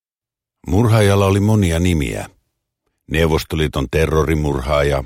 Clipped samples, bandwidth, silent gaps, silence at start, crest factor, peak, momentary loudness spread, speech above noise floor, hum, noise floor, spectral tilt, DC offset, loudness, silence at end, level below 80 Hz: under 0.1%; 16 kHz; none; 0.65 s; 16 dB; -2 dBFS; 10 LU; 74 dB; none; -89 dBFS; -6.5 dB/octave; under 0.1%; -17 LUFS; 0 s; -28 dBFS